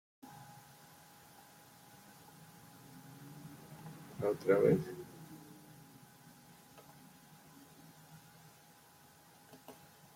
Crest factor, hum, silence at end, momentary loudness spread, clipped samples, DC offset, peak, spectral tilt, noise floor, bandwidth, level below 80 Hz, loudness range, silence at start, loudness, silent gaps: 24 dB; none; 0.45 s; 24 LU; under 0.1%; under 0.1%; -18 dBFS; -6.5 dB/octave; -62 dBFS; 16.5 kHz; -78 dBFS; 21 LU; 0.25 s; -35 LUFS; none